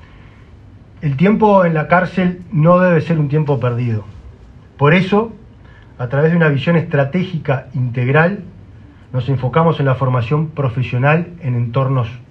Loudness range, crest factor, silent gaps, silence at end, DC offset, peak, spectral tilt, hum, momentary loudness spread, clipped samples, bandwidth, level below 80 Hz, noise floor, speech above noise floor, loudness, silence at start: 3 LU; 16 dB; none; 0.1 s; under 0.1%; 0 dBFS; -9.5 dB/octave; none; 9 LU; under 0.1%; 6 kHz; -44 dBFS; -40 dBFS; 26 dB; -15 LUFS; 0.75 s